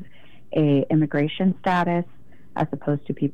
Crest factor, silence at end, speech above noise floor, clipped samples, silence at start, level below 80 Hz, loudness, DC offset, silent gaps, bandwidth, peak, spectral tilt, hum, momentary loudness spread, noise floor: 14 dB; 0.05 s; 30 dB; under 0.1%; 0 s; -58 dBFS; -23 LUFS; 1%; none; 7 kHz; -10 dBFS; -9 dB/octave; none; 8 LU; -51 dBFS